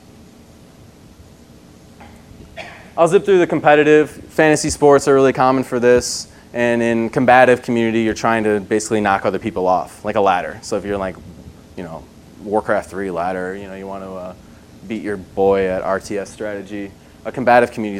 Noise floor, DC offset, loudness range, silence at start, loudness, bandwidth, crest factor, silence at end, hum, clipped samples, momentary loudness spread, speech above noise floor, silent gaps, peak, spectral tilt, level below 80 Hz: -44 dBFS; under 0.1%; 10 LU; 1.2 s; -16 LUFS; 15.5 kHz; 18 dB; 0 s; none; under 0.1%; 19 LU; 27 dB; none; 0 dBFS; -5 dB/octave; -46 dBFS